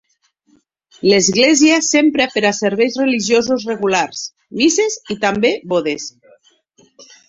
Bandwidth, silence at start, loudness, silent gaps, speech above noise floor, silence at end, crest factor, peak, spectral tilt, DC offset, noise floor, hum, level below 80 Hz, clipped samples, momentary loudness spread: 8 kHz; 1.05 s; -15 LUFS; none; 46 dB; 0.25 s; 16 dB; 0 dBFS; -3 dB/octave; under 0.1%; -61 dBFS; none; -58 dBFS; under 0.1%; 11 LU